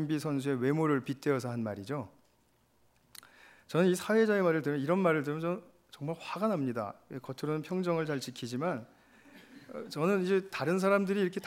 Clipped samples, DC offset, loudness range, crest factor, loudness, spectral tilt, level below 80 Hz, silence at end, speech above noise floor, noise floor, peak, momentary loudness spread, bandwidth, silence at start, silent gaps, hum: under 0.1%; under 0.1%; 5 LU; 18 dB; -32 LUFS; -6.5 dB/octave; -78 dBFS; 0 s; 38 dB; -70 dBFS; -14 dBFS; 13 LU; 16 kHz; 0 s; none; none